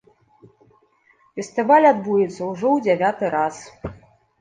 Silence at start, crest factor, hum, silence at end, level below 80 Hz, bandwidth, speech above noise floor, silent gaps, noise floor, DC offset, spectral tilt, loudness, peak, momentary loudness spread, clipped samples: 1.35 s; 18 dB; none; 0.45 s; -54 dBFS; 9.6 kHz; 40 dB; none; -59 dBFS; under 0.1%; -6 dB/octave; -19 LUFS; -4 dBFS; 21 LU; under 0.1%